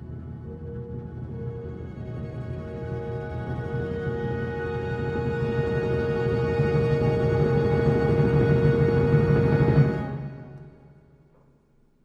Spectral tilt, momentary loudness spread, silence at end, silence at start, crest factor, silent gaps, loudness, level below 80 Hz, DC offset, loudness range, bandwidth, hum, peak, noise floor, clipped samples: -9.5 dB/octave; 16 LU; 1.15 s; 0 s; 18 dB; none; -25 LUFS; -40 dBFS; under 0.1%; 12 LU; 6.8 kHz; none; -8 dBFS; -61 dBFS; under 0.1%